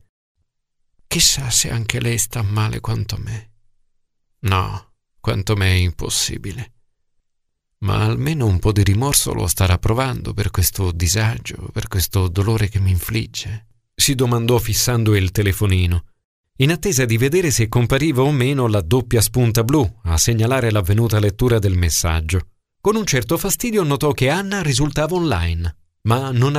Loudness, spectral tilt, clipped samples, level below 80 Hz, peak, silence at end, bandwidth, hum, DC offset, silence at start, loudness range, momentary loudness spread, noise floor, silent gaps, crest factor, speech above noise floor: -18 LUFS; -4.5 dB/octave; under 0.1%; -32 dBFS; 0 dBFS; 0 s; 16 kHz; none; under 0.1%; 1.1 s; 5 LU; 9 LU; -70 dBFS; 16.25-16.44 s; 18 dB; 53 dB